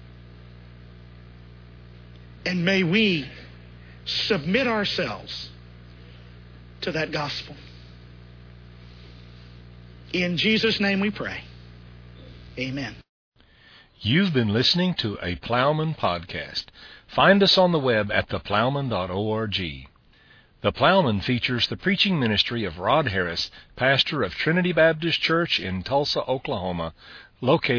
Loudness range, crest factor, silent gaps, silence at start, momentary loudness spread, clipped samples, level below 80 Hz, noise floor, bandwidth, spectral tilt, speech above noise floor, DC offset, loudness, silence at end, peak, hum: 11 LU; 22 dB; 13.09-13.32 s; 0 s; 13 LU; under 0.1%; -50 dBFS; -55 dBFS; 5.4 kHz; -6 dB/octave; 32 dB; under 0.1%; -23 LUFS; 0 s; -4 dBFS; none